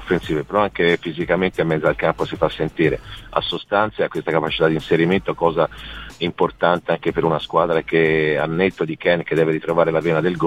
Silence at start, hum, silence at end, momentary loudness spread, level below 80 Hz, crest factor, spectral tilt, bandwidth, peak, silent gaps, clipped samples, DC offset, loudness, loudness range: 0 s; none; 0 s; 5 LU; -44 dBFS; 18 dB; -7 dB/octave; 12.5 kHz; -2 dBFS; none; under 0.1%; 0.2%; -19 LUFS; 2 LU